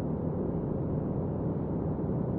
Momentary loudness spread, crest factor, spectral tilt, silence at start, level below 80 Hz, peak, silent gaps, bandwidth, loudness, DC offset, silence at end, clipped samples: 1 LU; 12 dB; -12.5 dB/octave; 0 s; -46 dBFS; -20 dBFS; none; 2.9 kHz; -32 LUFS; under 0.1%; 0 s; under 0.1%